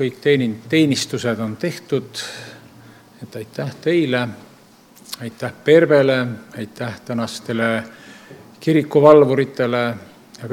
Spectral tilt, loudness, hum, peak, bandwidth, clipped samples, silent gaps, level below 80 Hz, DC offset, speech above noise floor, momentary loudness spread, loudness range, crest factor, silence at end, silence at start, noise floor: -6 dB/octave; -18 LUFS; none; 0 dBFS; 16 kHz; under 0.1%; none; -64 dBFS; under 0.1%; 30 dB; 20 LU; 7 LU; 18 dB; 0 s; 0 s; -48 dBFS